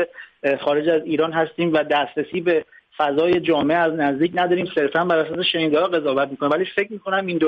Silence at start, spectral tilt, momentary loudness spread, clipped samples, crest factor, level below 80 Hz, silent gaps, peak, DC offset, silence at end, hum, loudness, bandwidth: 0 s; -7.5 dB/octave; 5 LU; under 0.1%; 14 dB; -62 dBFS; none; -6 dBFS; under 0.1%; 0 s; none; -20 LUFS; 5.8 kHz